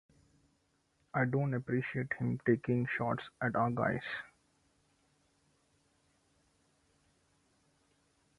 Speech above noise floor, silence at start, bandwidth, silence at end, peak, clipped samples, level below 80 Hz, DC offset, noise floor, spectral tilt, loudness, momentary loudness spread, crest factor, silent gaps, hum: 42 dB; 1.15 s; 10.5 kHz; 4.1 s; -16 dBFS; under 0.1%; -70 dBFS; under 0.1%; -76 dBFS; -8.5 dB/octave; -35 LUFS; 7 LU; 22 dB; none; none